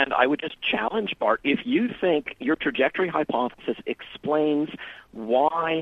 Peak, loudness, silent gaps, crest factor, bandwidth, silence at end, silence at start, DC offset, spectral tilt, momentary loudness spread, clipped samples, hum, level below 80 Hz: -6 dBFS; -25 LUFS; none; 20 dB; 5.6 kHz; 0 s; 0 s; under 0.1%; -7 dB/octave; 10 LU; under 0.1%; none; -60 dBFS